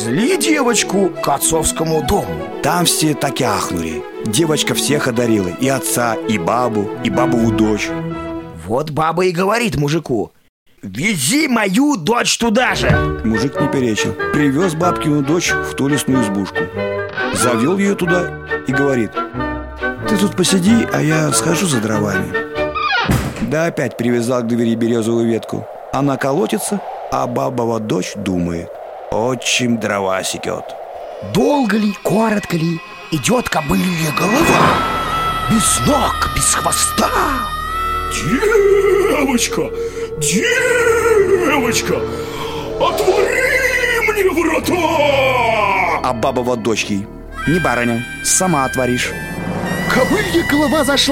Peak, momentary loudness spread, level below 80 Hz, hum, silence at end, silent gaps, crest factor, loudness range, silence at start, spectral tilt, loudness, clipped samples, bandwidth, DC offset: 0 dBFS; 9 LU; -36 dBFS; none; 0 s; 10.49-10.66 s; 16 dB; 4 LU; 0 s; -4 dB/octave; -16 LUFS; under 0.1%; 17 kHz; under 0.1%